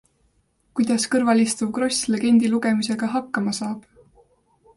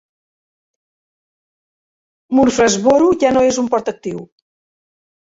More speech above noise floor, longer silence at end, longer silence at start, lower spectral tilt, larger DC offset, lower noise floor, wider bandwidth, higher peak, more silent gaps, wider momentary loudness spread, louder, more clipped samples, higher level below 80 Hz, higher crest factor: second, 44 dB vs over 76 dB; about the same, 0.95 s vs 0.95 s; second, 0.75 s vs 2.3 s; about the same, -4 dB/octave vs -4 dB/octave; neither; second, -65 dBFS vs under -90 dBFS; first, 11.5 kHz vs 8 kHz; second, -8 dBFS vs -2 dBFS; neither; second, 9 LU vs 14 LU; second, -21 LUFS vs -14 LUFS; neither; second, -62 dBFS vs -50 dBFS; about the same, 14 dB vs 16 dB